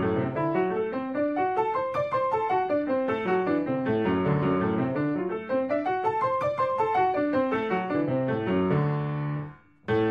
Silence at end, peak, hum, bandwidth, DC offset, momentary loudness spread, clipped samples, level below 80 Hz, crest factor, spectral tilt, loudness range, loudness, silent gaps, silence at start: 0 s; -14 dBFS; none; 7 kHz; under 0.1%; 4 LU; under 0.1%; -60 dBFS; 12 dB; -9 dB/octave; 1 LU; -27 LUFS; none; 0 s